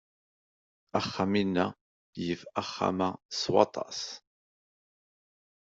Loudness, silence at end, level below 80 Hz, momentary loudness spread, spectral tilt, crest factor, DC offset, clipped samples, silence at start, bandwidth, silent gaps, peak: -31 LUFS; 1.45 s; -70 dBFS; 11 LU; -5 dB/octave; 26 dB; under 0.1%; under 0.1%; 0.95 s; 7.8 kHz; 1.81-2.13 s, 3.25-3.29 s; -6 dBFS